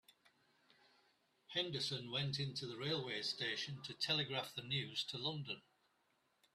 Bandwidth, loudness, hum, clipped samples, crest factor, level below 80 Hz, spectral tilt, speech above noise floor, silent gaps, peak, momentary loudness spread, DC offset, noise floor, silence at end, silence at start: 13.5 kHz; -41 LUFS; none; under 0.1%; 22 dB; -80 dBFS; -4 dB/octave; 37 dB; none; -24 dBFS; 6 LU; under 0.1%; -80 dBFS; 0.95 s; 1.5 s